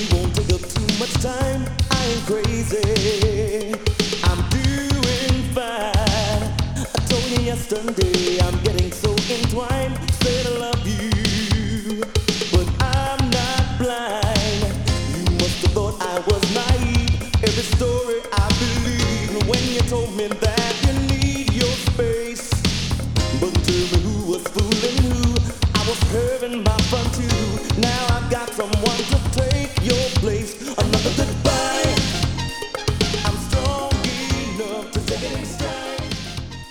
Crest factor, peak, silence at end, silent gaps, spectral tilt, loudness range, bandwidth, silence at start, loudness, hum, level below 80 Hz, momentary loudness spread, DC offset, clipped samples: 18 dB; -2 dBFS; 0 s; none; -4.5 dB/octave; 1 LU; 20 kHz; 0 s; -21 LUFS; none; -28 dBFS; 5 LU; under 0.1%; under 0.1%